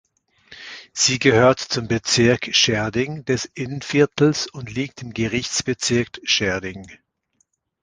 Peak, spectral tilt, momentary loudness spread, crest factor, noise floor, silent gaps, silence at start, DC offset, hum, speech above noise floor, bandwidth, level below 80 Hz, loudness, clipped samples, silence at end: 0 dBFS; -3.5 dB/octave; 13 LU; 20 dB; -68 dBFS; none; 0.5 s; under 0.1%; none; 48 dB; 10.5 kHz; -50 dBFS; -20 LUFS; under 0.1%; 0.9 s